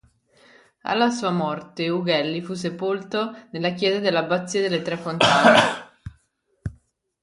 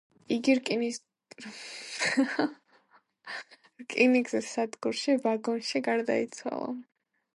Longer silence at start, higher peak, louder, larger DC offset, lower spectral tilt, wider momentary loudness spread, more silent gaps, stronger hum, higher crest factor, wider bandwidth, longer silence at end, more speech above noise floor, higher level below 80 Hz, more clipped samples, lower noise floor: first, 0.85 s vs 0.3 s; first, 0 dBFS vs -12 dBFS; first, -21 LUFS vs -29 LUFS; neither; about the same, -4.5 dB/octave vs -3.5 dB/octave; first, 19 LU vs 16 LU; neither; neither; about the same, 22 dB vs 20 dB; about the same, 11.5 kHz vs 11.5 kHz; about the same, 0.5 s vs 0.55 s; first, 45 dB vs 36 dB; first, -54 dBFS vs -82 dBFS; neither; about the same, -67 dBFS vs -65 dBFS